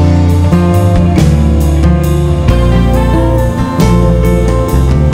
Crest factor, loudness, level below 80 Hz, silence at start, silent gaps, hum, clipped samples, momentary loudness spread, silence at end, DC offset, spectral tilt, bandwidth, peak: 8 dB; -10 LUFS; -12 dBFS; 0 s; none; none; 0.3%; 2 LU; 0 s; under 0.1%; -7.5 dB/octave; 16.5 kHz; 0 dBFS